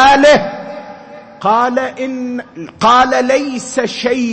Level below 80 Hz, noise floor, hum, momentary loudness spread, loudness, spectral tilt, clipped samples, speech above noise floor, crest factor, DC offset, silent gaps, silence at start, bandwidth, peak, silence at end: -44 dBFS; -34 dBFS; none; 20 LU; -13 LUFS; -3.5 dB/octave; under 0.1%; 20 dB; 12 dB; under 0.1%; none; 0 s; 8.8 kHz; 0 dBFS; 0 s